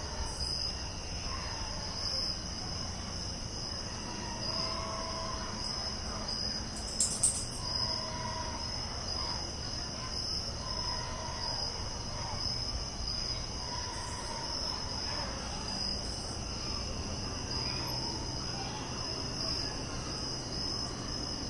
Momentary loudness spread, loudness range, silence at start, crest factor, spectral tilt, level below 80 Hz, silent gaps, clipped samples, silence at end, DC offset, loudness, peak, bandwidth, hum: 5 LU; 3 LU; 0 s; 22 dB; -2.5 dB/octave; -46 dBFS; none; under 0.1%; 0 s; under 0.1%; -35 LUFS; -14 dBFS; 12 kHz; none